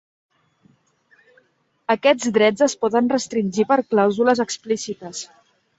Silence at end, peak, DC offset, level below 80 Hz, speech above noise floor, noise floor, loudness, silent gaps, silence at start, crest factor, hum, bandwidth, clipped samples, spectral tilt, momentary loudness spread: 0.55 s; -2 dBFS; under 0.1%; -66 dBFS; 43 dB; -63 dBFS; -19 LUFS; none; 1.9 s; 18 dB; none; 8.2 kHz; under 0.1%; -4 dB/octave; 14 LU